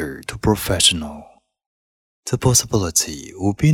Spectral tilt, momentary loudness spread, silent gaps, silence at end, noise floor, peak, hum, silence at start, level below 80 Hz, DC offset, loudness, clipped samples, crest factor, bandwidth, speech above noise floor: -3.5 dB/octave; 13 LU; 1.66-2.23 s; 0 s; under -90 dBFS; 0 dBFS; none; 0 s; -40 dBFS; under 0.1%; -18 LUFS; under 0.1%; 20 dB; 18 kHz; over 72 dB